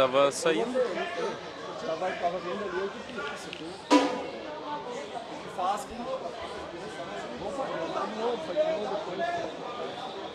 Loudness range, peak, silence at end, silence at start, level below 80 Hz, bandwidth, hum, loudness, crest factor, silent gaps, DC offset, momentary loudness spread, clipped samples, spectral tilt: 4 LU; -6 dBFS; 0 s; 0 s; -66 dBFS; 13.5 kHz; none; -31 LUFS; 24 dB; none; under 0.1%; 13 LU; under 0.1%; -4 dB/octave